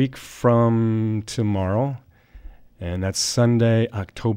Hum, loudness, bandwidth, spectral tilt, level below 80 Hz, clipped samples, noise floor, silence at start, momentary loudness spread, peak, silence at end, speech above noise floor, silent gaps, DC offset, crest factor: none; -21 LUFS; 15.5 kHz; -6 dB/octave; -48 dBFS; under 0.1%; -43 dBFS; 0 s; 10 LU; -6 dBFS; 0 s; 22 dB; none; under 0.1%; 16 dB